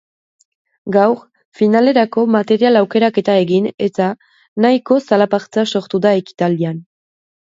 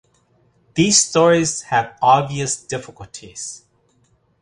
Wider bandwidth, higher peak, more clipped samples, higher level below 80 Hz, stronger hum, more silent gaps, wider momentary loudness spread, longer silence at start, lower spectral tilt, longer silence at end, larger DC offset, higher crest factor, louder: second, 7.8 kHz vs 11.5 kHz; about the same, 0 dBFS vs -2 dBFS; neither; second, -64 dBFS vs -54 dBFS; neither; first, 1.45-1.52 s, 3.74-3.78 s, 4.48-4.56 s vs none; second, 8 LU vs 18 LU; about the same, 0.85 s vs 0.75 s; first, -7 dB/octave vs -3.5 dB/octave; second, 0.65 s vs 0.85 s; neither; about the same, 14 dB vs 18 dB; about the same, -15 LUFS vs -17 LUFS